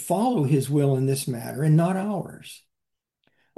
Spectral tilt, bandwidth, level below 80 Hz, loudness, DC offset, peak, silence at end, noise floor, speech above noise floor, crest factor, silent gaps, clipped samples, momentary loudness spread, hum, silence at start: -7 dB/octave; 12.5 kHz; -68 dBFS; -23 LUFS; under 0.1%; -10 dBFS; 1 s; -84 dBFS; 61 dB; 14 dB; none; under 0.1%; 15 LU; none; 0 s